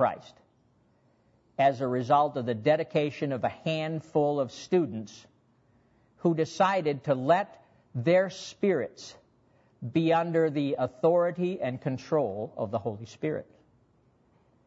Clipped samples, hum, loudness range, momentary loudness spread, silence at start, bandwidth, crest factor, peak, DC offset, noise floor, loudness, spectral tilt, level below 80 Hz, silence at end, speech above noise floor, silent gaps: under 0.1%; none; 3 LU; 12 LU; 0 s; 8 kHz; 18 dB; -10 dBFS; under 0.1%; -66 dBFS; -28 LUFS; -7 dB/octave; -72 dBFS; 1.25 s; 39 dB; none